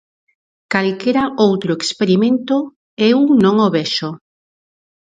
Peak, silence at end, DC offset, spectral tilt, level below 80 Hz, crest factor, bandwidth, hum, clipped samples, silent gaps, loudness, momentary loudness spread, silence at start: 0 dBFS; 0.9 s; under 0.1%; -5.5 dB/octave; -60 dBFS; 16 dB; 9.4 kHz; none; under 0.1%; 2.76-2.97 s; -15 LUFS; 9 LU; 0.7 s